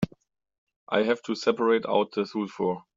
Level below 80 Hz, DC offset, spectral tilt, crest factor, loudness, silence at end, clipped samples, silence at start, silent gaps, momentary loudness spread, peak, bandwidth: -64 dBFS; under 0.1%; -4 dB/octave; 20 dB; -26 LUFS; 0.15 s; under 0.1%; 0 s; 0.58-0.67 s, 0.76-0.87 s; 7 LU; -8 dBFS; 7.6 kHz